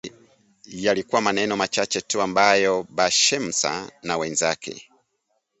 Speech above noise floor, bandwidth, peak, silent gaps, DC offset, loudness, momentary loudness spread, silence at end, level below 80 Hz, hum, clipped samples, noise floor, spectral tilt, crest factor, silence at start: 51 dB; 8.2 kHz; -2 dBFS; none; under 0.1%; -21 LUFS; 13 LU; 0.8 s; -62 dBFS; none; under 0.1%; -73 dBFS; -2 dB/octave; 22 dB; 0.05 s